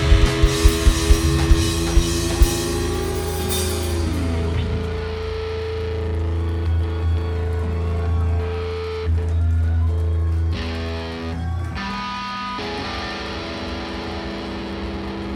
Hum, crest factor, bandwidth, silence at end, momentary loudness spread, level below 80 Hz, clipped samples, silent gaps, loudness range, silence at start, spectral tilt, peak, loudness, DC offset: none; 20 dB; over 20 kHz; 0 s; 10 LU; -24 dBFS; under 0.1%; none; 7 LU; 0 s; -5 dB/octave; 0 dBFS; -22 LUFS; under 0.1%